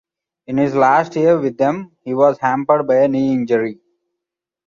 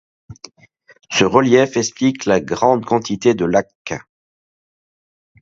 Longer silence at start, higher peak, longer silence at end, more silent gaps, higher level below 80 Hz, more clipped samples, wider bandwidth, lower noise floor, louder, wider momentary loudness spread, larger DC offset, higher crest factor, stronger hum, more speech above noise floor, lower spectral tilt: first, 0.5 s vs 0.3 s; about the same, -2 dBFS vs 0 dBFS; second, 0.95 s vs 1.4 s; second, none vs 3.75-3.85 s; second, -60 dBFS vs -52 dBFS; neither; about the same, 7.2 kHz vs 7.8 kHz; second, -83 dBFS vs under -90 dBFS; about the same, -16 LUFS vs -16 LUFS; second, 8 LU vs 14 LU; neither; about the same, 16 dB vs 18 dB; neither; second, 68 dB vs over 74 dB; first, -7.5 dB/octave vs -4.5 dB/octave